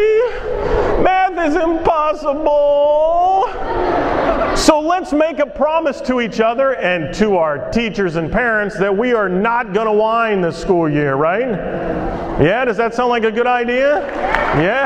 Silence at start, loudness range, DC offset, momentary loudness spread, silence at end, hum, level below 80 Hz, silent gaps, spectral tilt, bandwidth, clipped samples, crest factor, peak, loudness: 0 s; 2 LU; under 0.1%; 5 LU; 0 s; none; -32 dBFS; none; -5.5 dB/octave; 13.5 kHz; under 0.1%; 16 dB; 0 dBFS; -16 LUFS